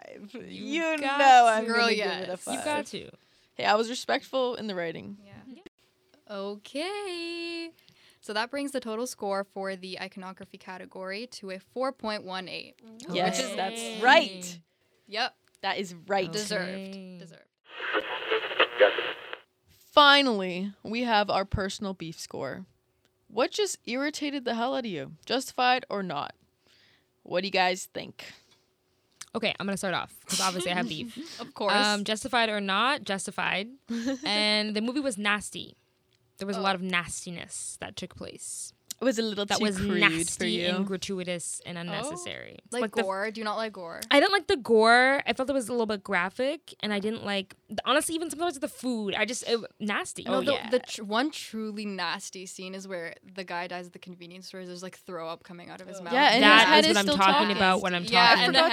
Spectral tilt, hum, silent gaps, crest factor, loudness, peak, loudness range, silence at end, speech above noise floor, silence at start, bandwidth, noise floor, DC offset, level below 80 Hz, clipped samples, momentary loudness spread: -3 dB/octave; none; 5.68-5.78 s; 28 dB; -26 LUFS; 0 dBFS; 11 LU; 0 s; 43 dB; 0.1 s; 16 kHz; -71 dBFS; under 0.1%; -60 dBFS; under 0.1%; 19 LU